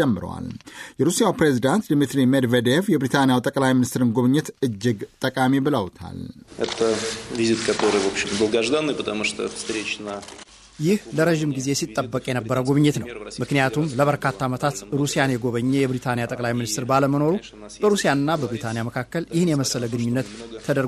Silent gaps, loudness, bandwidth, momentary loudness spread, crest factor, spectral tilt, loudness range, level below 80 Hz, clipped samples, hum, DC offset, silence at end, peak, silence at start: none; -22 LUFS; 13.5 kHz; 11 LU; 16 dB; -5 dB/octave; 4 LU; -54 dBFS; under 0.1%; none; under 0.1%; 0 s; -6 dBFS; 0 s